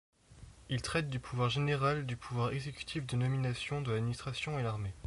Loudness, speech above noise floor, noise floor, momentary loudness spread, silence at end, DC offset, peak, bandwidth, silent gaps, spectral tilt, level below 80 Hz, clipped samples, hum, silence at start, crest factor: -35 LUFS; 21 dB; -56 dBFS; 8 LU; 0 s; under 0.1%; -20 dBFS; 11.5 kHz; none; -6 dB/octave; -56 dBFS; under 0.1%; none; 0.3 s; 16 dB